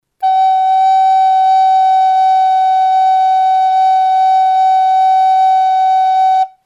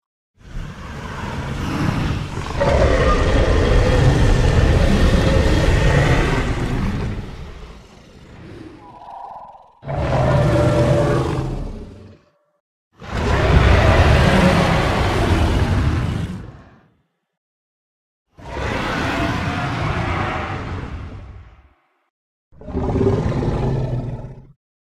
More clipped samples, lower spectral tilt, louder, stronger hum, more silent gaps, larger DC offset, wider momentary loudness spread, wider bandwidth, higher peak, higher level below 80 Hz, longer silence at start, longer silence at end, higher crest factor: neither; second, 2.5 dB/octave vs -6.5 dB/octave; first, -10 LUFS vs -18 LUFS; neither; second, none vs 12.60-12.91 s, 17.37-18.26 s, 22.10-22.51 s; neither; second, 1 LU vs 21 LU; second, 7.2 kHz vs 13 kHz; second, -4 dBFS vs 0 dBFS; second, -80 dBFS vs -24 dBFS; second, 0.2 s vs 0.45 s; second, 0.2 s vs 0.45 s; second, 6 dB vs 18 dB